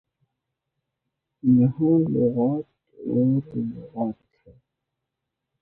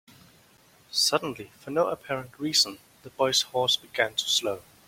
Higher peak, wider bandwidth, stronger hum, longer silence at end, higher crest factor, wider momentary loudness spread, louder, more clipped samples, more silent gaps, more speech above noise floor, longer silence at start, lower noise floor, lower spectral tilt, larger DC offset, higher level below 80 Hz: about the same, -8 dBFS vs -8 dBFS; second, 2.5 kHz vs 16.5 kHz; neither; first, 1.5 s vs 0.25 s; second, 16 dB vs 22 dB; about the same, 13 LU vs 11 LU; first, -23 LUFS vs -26 LUFS; neither; neither; first, 61 dB vs 31 dB; first, 1.45 s vs 0.9 s; first, -83 dBFS vs -59 dBFS; first, -14.5 dB/octave vs -1.5 dB/octave; neither; first, -62 dBFS vs -68 dBFS